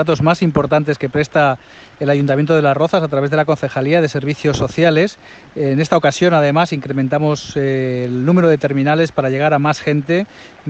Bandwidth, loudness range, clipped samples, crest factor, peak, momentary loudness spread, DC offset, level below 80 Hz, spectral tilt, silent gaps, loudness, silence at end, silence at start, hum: 8.4 kHz; 1 LU; under 0.1%; 14 dB; 0 dBFS; 6 LU; under 0.1%; -48 dBFS; -6.5 dB/octave; none; -15 LUFS; 0 s; 0 s; none